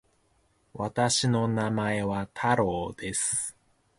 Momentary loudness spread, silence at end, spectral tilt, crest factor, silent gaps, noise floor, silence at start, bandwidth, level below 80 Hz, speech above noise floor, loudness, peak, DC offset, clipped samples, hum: 9 LU; 0.45 s; -4 dB/octave; 18 dB; none; -68 dBFS; 0.75 s; 11.5 kHz; -56 dBFS; 41 dB; -27 LUFS; -10 dBFS; under 0.1%; under 0.1%; none